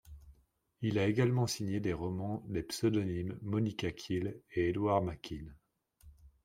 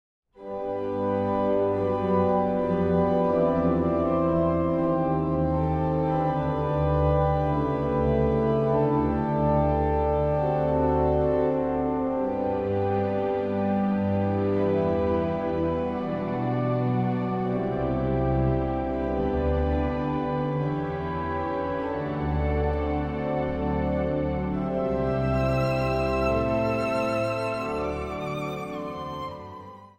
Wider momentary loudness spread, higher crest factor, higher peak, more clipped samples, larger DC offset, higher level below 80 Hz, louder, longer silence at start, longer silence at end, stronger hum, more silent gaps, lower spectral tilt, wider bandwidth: first, 9 LU vs 6 LU; first, 20 dB vs 14 dB; second, -16 dBFS vs -12 dBFS; neither; neither; second, -60 dBFS vs -38 dBFS; second, -35 LUFS vs -26 LUFS; second, 0.05 s vs 0.4 s; about the same, 0.15 s vs 0.1 s; neither; neither; second, -6.5 dB/octave vs -9 dB/octave; first, 16 kHz vs 8.8 kHz